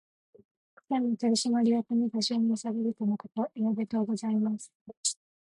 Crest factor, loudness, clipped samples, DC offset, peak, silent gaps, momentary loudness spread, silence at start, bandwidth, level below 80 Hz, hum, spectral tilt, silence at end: 14 dB; -29 LUFS; under 0.1%; under 0.1%; -16 dBFS; 4.75-4.86 s, 4.97-5.04 s; 6 LU; 0.9 s; 11.5 kHz; -78 dBFS; none; -4.5 dB/octave; 0.35 s